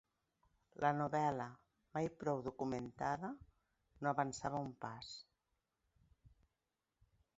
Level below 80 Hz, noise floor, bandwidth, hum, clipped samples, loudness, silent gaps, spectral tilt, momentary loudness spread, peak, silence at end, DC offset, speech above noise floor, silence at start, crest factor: -72 dBFS; -90 dBFS; 7.6 kHz; none; under 0.1%; -42 LUFS; none; -5.5 dB/octave; 13 LU; -20 dBFS; 1.1 s; under 0.1%; 49 dB; 0.8 s; 24 dB